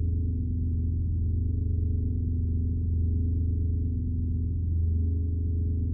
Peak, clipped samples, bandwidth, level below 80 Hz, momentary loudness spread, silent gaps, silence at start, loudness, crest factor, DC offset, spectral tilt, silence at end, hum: -18 dBFS; under 0.1%; 0.6 kHz; -30 dBFS; 2 LU; none; 0 s; -29 LUFS; 8 dB; under 0.1%; -21 dB/octave; 0 s; none